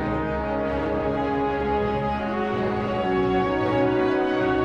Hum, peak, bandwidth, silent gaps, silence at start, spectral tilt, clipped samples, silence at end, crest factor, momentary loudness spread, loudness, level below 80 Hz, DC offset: none; -12 dBFS; 7.6 kHz; none; 0 s; -8 dB/octave; under 0.1%; 0 s; 12 dB; 4 LU; -24 LUFS; -40 dBFS; under 0.1%